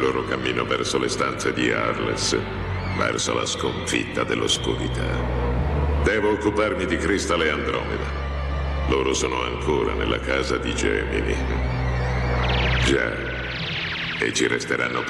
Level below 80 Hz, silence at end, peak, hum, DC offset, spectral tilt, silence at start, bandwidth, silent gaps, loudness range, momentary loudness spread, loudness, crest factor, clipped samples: -30 dBFS; 0 s; -10 dBFS; none; under 0.1%; -4.5 dB/octave; 0 s; 12 kHz; none; 1 LU; 5 LU; -23 LUFS; 14 dB; under 0.1%